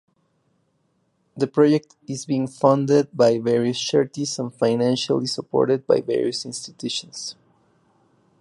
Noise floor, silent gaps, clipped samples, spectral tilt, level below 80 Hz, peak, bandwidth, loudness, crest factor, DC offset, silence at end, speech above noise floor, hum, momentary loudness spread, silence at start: -68 dBFS; none; under 0.1%; -5.5 dB/octave; -68 dBFS; -4 dBFS; 11.5 kHz; -21 LUFS; 20 dB; under 0.1%; 1.1 s; 47 dB; none; 12 LU; 1.35 s